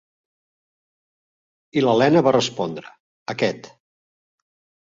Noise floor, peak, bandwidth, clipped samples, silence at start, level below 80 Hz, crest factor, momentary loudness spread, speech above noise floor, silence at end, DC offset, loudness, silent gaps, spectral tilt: under -90 dBFS; -2 dBFS; 7.6 kHz; under 0.1%; 1.75 s; -66 dBFS; 20 dB; 21 LU; over 71 dB; 1.2 s; under 0.1%; -20 LUFS; 3.00-3.26 s; -5.5 dB/octave